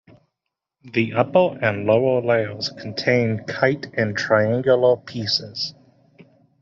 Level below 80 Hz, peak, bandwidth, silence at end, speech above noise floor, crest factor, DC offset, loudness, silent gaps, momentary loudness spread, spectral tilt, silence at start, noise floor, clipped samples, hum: -62 dBFS; -2 dBFS; 7.4 kHz; 0.9 s; 62 dB; 18 dB; under 0.1%; -20 LUFS; none; 9 LU; -6 dB/octave; 0.85 s; -82 dBFS; under 0.1%; none